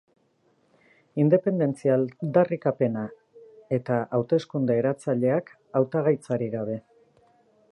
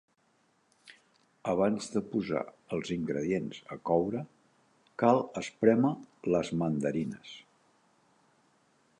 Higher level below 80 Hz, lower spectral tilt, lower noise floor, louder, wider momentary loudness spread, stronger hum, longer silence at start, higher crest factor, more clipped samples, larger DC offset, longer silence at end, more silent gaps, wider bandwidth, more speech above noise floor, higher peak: second, -72 dBFS vs -66 dBFS; first, -9 dB/octave vs -6.5 dB/octave; second, -66 dBFS vs -71 dBFS; first, -25 LUFS vs -31 LUFS; second, 9 LU vs 14 LU; neither; first, 1.15 s vs 0.85 s; about the same, 20 dB vs 22 dB; neither; neither; second, 0.95 s vs 1.6 s; neither; about the same, 11 kHz vs 10.5 kHz; about the same, 42 dB vs 41 dB; first, -6 dBFS vs -10 dBFS